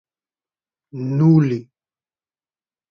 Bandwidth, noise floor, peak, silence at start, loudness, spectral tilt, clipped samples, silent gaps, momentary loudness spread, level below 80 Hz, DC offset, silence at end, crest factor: 6.4 kHz; under -90 dBFS; -4 dBFS; 0.95 s; -17 LUFS; -10.5 dB/octave; under 0.1%; none; 16 LU; -64 dBFS; under 0.1%; 1.25 s; 18 dB